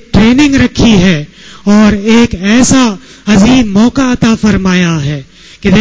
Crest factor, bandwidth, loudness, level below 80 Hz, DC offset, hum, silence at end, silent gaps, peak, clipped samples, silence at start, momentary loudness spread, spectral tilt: 8 dB; 8 kHz; -8 LUFS; -26 dBFS; under 0.1%; none; 0 s; none; 0 dBFS; 0.2%; 0.15 s; 10 LU; -5 dB/octave